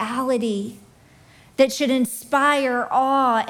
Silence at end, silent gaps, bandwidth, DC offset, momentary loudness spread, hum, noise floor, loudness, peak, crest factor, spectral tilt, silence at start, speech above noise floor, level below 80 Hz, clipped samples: 0 s; none; 18.5 kHz; under 0.1%; 9 LU; none; -51 dBFS; -20 LUFS; -4 dBFS; 16 dB; -3.5 dB/octave; 0 s; 31 dB; -64 dBFS; under 0.1%